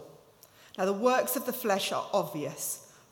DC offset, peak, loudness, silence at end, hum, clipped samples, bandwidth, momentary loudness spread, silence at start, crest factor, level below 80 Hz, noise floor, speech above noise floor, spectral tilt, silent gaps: under 0.1%; -12 dBFS; -30 LUFS; 0.25 s; none; under 0.1%; 19 kHz; 9 LU; 0 s; 18 dB; -78 dBFS; -57 dBFS; 28 dB; -3.5 dB/octave; none